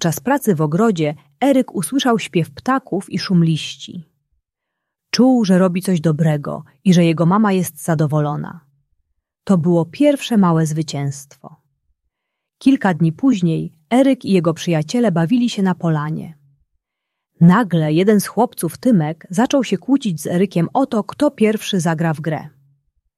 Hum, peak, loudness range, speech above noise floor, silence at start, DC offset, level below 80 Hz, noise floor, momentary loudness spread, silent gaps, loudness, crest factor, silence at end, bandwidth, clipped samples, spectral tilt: none; -2 dBFS; 3 LU; 63 dB; 0 s; under 0.1%; -60 dBFS; -79 dBFS; 9 LU; none; -17 LUFS; 16 dB; 0.7 s; 14 kHz; under 0.1%; -6.5 dB/octave